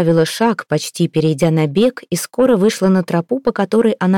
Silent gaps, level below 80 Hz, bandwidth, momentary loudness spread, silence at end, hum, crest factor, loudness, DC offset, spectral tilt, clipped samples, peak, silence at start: none; -50 dBFS; 17 kHz; 6 LU; 0 s; none; 10 dB; -16 LUFS; under 0.1%; -6 dB/octave; under 0.1%; -4 dBFS; 0 s